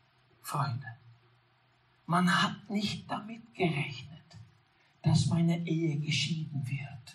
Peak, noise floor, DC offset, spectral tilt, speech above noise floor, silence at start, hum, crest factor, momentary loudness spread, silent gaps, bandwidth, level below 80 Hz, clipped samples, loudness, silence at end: -16 dBFS; -68 dBFS; under 0.1%; -5.5 dB/octave; 37 dB; 0.45 s; none; 18 dB; 19 LU; none; 13 kHz; -68 dBFS; under 0.1%; -32 LUFS; 0 s